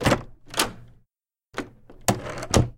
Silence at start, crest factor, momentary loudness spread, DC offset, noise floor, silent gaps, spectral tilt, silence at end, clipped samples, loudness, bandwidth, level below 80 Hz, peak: 0 s; 24 dB; 13 LU; under 0.1%; -77 dBFS; none; -4 dB/octave; 0.05 s; under 0.1%; -27 LUFS; 17 kHz; -40 dBFS; -4 dBFS